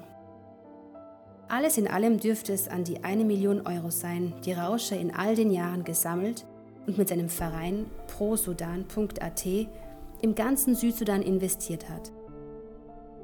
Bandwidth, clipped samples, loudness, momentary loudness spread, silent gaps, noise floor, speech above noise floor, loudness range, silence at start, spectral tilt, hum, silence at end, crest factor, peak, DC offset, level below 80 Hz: 19.5 kHz; under 0.1%; -29 LUFS; 20 LU; none; -50 dBFS; 22 dB; 3 LU; 0 s; -5 dB/octave; none; 0 s; 18 dB; -12 dBFS; under 0.1%; -50 dBFS